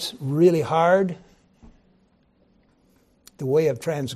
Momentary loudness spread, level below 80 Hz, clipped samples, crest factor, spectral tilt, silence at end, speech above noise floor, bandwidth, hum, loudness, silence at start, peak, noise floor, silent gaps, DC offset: 11 LU; -62 dBFS; under 0.1%; 18 dB; -6.5 dB/octave; 0 s; 41 dB; 14 kHz; none; -21 LUFS; 0 s; -6 dBFS; -62 dBFS; none; under 0.1%